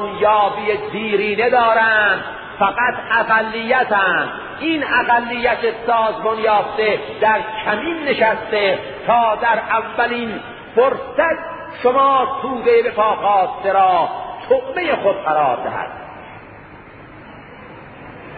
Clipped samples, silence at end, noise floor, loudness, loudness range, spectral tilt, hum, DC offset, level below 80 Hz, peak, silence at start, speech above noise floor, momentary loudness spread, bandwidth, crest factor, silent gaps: under 0.1%; 0 s; -39 dBFS; -17 LUFS; 3 LU; -9.5 dB/octave; none; under 0.1%; -52 dBFS; -2 dBFS; 0 s; 22 dB; 12 LU; 4.8 kHz; 16 dB; none